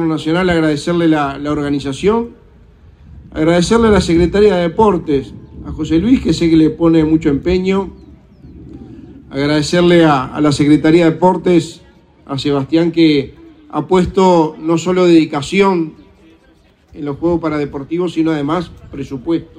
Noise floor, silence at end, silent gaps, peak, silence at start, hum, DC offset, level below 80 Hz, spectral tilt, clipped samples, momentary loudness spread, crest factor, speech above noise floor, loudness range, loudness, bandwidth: -49 dBFS; 0.15 s; none; 0 dBFS; 0 s; none; under 0.1%; -36 dBFS; -6.5 dB/octave; under 0.1%; 15 LU; 14 dB; 37 dB; 4 LU; -13 LUFS; 10.5 kHz